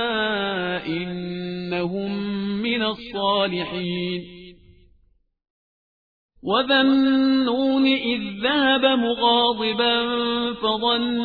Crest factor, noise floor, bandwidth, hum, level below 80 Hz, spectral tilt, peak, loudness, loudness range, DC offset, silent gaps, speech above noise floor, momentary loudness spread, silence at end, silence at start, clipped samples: 16 dB; -62 dBFS; 4.9 kHz; none; -56 dBFS; -7.5 dB/octave; -6 dBFS; -21 LUFS; 9 LU; under 0.1%; 5.50-6.29 s; 41 dB; 10 LU; 0 s; 0 s; under 0.1%